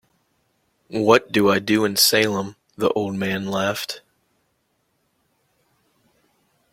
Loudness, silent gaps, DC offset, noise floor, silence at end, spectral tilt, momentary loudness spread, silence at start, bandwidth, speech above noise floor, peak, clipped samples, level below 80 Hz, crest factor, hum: -20 LUFS; none; under 0.1%; -69 dBFS; 2.75 s; -3.5 dB/octave; 15 LU; 0.9 s; 16.5 kHz; 50 dB; -2 dBFS; under 0.1%; -62 dBFS; 22 dB; none